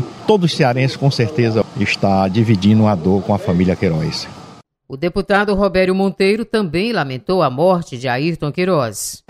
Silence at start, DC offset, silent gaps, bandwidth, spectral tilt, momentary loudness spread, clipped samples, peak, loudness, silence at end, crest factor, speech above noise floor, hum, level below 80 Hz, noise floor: 0 s; under 0.1%; none; 15 kHz; -6 dB/octave; 7 LU; under 0.1%; 0 dBFS; -16 LUFS; 0.15 s; 16 dB; 25 dB; none; -42 dBFS; -41 dBFS